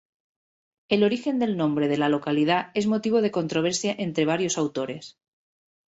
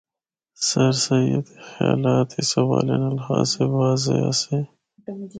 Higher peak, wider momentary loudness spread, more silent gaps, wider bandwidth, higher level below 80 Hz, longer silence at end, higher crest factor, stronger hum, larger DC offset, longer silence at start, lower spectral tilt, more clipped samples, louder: second, -8 dBFS vs -4 dBFS; second, 4 LU vs 16 LU; neither; second, 8.2 kHz vs 9.4 kHz; second, -68 dBFS vs -58 dBFS; first, 0.85 s vs 0 s; about the same, 18 dB vs 18 dB; neither; neither; first, 0.9 s vs 0.6 s; about the same, -5 dB/octave vs -5 dB/octave; neither; second, -24 LUFS vs -21 LUFS